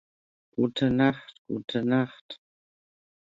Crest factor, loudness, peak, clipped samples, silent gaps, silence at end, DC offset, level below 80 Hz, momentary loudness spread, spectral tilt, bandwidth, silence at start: 20 dB; -27 LUFS; -8 dBFS; under 0.1%; 1.39-1.45 s, 2.21-2.29 s; 0.9 s; under 0.1%; -62 dBFS; 21 LU; -7.5 dB/octave; 7.6 kHz; 0.6 s